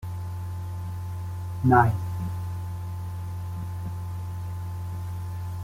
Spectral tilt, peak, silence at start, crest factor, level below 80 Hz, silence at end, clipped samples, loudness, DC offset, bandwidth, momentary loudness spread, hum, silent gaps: -8 dB/octave; -6 dBFS; 0 s; 22 dB; -50 dBFS; 0 s; under 0.1%; -29 LUFS; under 0.1%; 16 kHz; 14 LU; none; none